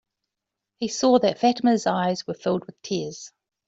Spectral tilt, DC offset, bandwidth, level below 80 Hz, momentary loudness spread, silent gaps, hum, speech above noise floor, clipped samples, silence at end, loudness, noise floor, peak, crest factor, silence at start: -5 dB/octave; under 0.1%; 7.8 kHz; -66 dBFS; 14 LU; none; none; 62 dB; under 0.1%; 0.4 s; -23 LUFS; -85 dBFS; -6 dBFS; 18 dB; 0.8 s